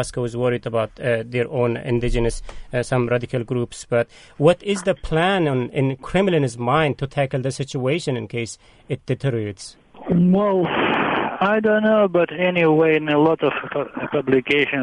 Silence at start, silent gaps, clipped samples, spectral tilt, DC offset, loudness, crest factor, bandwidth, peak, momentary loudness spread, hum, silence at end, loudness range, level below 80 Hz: 0 s; none; under 0.1%; -6.5 dB/octave; under 0.1%; -20 LUFS; 18 dB; 10.5 kHz; -2 dBFS; 10 LU; none; 0 s; 5 LU; -38 dBFS